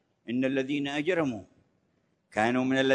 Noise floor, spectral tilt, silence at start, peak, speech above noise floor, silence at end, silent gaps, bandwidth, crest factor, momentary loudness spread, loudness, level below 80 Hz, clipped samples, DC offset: -72 dBFS; -5.5 dB/octave; 0.25 s; -10 dBFS; 45 dB; 0 s; none; 9.8 kHz; 20 dB; 9 LU; -29 LUFS; -70 dBFS; under 0.1%; under 0.1%